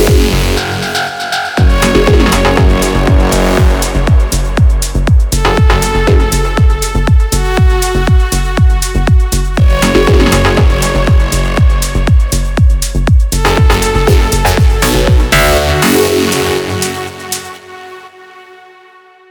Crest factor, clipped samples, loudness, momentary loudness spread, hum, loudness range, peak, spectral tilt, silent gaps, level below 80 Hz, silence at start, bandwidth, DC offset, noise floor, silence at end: 10 dB; under 0.1%; -11 LUFS; 6 LU; none; 2 LU; 0 dBFS; -5 dB/octave; none; -12 dBFS; 0 s; over 20 kHz; under 0.1%; -40 dBFS; 0.9 s